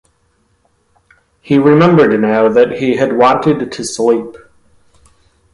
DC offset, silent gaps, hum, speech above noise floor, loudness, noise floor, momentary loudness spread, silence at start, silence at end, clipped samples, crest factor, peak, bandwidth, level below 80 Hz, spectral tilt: under 0.1%; none; none; 47 dB; -11 LUFS; -58 dBFS; 9 LU; 1.45 s; 1.15 s; under 0.1%; 14 dB; 0 dBFS; 11.5 kHz; -50 dBFS; -6.5 dB/octave